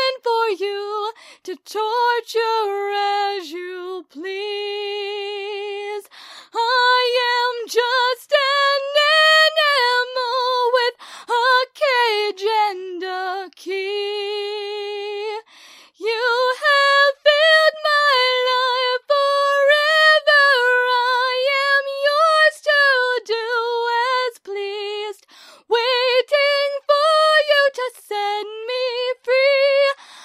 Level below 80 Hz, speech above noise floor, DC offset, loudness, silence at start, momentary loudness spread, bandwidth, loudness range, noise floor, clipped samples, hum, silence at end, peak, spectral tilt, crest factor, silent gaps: -86 dBFS; 25 dB; under 0.1%; -17 LUFS; 0 s; 14 LU; 15.5 kHz; 9 LU; -47 dBFS; under 0.1%; none; 0 s; -2 dBFS; 1.5 dB/octave; 16 dB; none